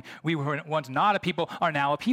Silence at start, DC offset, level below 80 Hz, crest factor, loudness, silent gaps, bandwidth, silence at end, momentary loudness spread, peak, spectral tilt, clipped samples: 0.05 s; under 0.1%; -68 dBFS; 14 dB; -27 LUFS; none; 15 kHz; 0 s; 5 LU; -12 dBFS; -6 dB/octave; under 0.1%